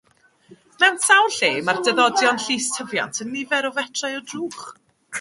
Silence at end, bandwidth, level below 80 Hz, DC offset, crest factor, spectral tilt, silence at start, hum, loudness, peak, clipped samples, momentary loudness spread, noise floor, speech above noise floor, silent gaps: 0 s; 11.5 kHz; -70 dBFS; under 0.1%; 20 dB; -1 dB/octave; 0.5 s; none; -19 LUFS; -2 dBFS; under 0.1%; 15 LU; -52 dBFS; 32 dB; none